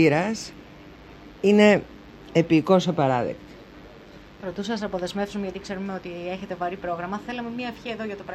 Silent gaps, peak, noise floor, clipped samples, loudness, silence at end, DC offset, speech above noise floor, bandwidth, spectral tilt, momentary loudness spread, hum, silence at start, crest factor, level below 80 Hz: none; -4 dBFS; -46 dBFS; under 0.1%; -24 LUFS; 0 s; under 0.1%; 22 dB; 12.5 kHz; -6 dB/octave; 26 LU; none; 0 s; 20 dB; -54 dBFS